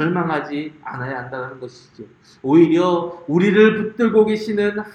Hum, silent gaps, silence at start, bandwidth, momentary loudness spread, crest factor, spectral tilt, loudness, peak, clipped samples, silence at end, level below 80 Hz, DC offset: none; none; 0 s; 8.8 kHz; 16 LU; 16 dB; -7.5 dB/octave; -17 LUFS; -2 dBFS; under 0.1%; 0.05 s; -60 dBFS; under 0.1%